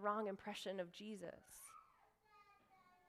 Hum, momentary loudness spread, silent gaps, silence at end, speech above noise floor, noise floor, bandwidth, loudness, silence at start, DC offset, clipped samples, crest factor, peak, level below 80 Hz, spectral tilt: none; 21 LU; none; 0.15 s; 26 dB; -74 dBFS; 15.5 kHz; -49 LUFS; 0 s; under 0.1%; under 0.1%; 22 dB; -28 dBFS; -86 dBFS; -4 dB/octave